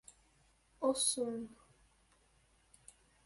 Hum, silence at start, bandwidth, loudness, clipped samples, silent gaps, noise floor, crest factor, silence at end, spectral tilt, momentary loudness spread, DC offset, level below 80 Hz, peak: none; 0.8 s; 12 kHz; -36 LUFS; under 0.1%; none; -71 dBFS; 22 dB; 1.7 s; -2 dB/octave; 14 LU; under 0.1%; -74 dBFS; -20 dBFS